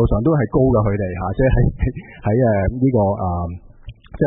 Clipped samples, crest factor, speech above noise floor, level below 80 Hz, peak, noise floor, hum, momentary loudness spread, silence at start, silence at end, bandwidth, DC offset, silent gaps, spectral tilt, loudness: under 0.1%; 14 dB; 21 dB; -28 dBFS; -4 dBFS; -38 dBFS; none; 9 LU; 0 s; 0 s; 3.9 kHz; under 0.1%; none; -14 dB/octave; -18 LUFS